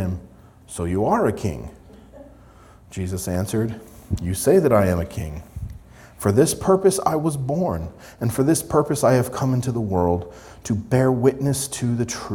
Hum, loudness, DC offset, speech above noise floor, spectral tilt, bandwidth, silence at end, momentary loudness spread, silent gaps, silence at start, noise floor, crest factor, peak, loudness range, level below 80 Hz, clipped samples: none; -21 LUFS; under 0.1%; 27 dB; -6 dB/octave; 19 kHz; 0 s; 17 LU; none; 0 s; -47 dBFS; 18 dB; -2 dBFS; 6 LU; -44 dBFS; under 0.1%